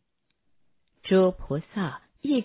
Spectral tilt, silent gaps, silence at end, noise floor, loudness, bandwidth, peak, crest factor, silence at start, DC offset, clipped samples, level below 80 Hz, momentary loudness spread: -11 dB/octave; none; 0 s; -75 dBFS; -26 LUFS; 4 kHz; -10 dBFS; 16 dB; 1.05 s; under 0.1%; under 0.1%; -52 dBFS; 13 LU